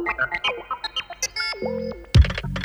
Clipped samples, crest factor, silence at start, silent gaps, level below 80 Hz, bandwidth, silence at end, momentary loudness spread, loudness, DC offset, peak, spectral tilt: under 0.1%; 20 dB; 0 s; none; -28 dBFS; 12.5 kHz; 0 s; 10 LU; -24 LUFS; under 0.1%; -4 dBFS; -4.5 dB/octave